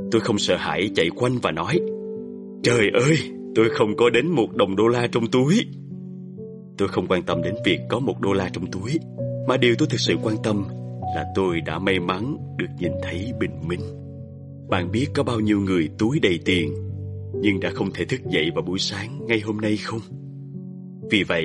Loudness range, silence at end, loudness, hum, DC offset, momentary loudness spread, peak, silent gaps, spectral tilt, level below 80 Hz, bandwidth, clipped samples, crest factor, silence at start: 5 LU; 0 s; -23 LUFS; none; under 0.1%; 17 LU; -4 dBFS; none; -5.5 dB/octave; -54 dBFS; 11.5 kHz; under 0.1%; 18 dB; 0 s